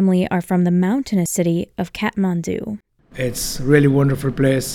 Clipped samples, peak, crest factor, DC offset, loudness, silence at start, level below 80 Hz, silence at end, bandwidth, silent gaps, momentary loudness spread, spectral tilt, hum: under 0.1%; 0 dBFS; 18 dB; under 0.1%; -19 LUFS; 0 s; -42 dBFS; 0 s; 17 kHz; none; 11 LU; -6 dB/octave; none